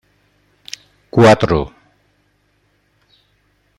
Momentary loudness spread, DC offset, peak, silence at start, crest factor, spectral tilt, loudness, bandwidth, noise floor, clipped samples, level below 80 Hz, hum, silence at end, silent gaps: 23 LU; under 0.1%; 0 dBFS; 1.15 s; 18 dB; -6.5 dB/octave; -13 LUFS; 14.5 kHz; -61 dBFS; under 0.1%; -42 dBFS; 50 Hz at -45 dBFS; 2.1 s; none